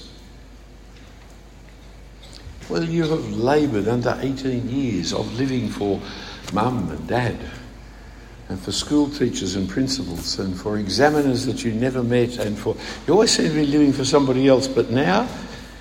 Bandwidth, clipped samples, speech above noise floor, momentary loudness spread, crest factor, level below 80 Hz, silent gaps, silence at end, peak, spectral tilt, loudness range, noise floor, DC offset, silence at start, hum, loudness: 16 kHz; under 0.1%; 22 dB; 16 LU; 20 dB; -42 dBFS; none; 0 s; -2 dBFS; -5 dB/octave; 7 LU; -43 dBFS; under 0.1%; 0 s; none; -21 LUFS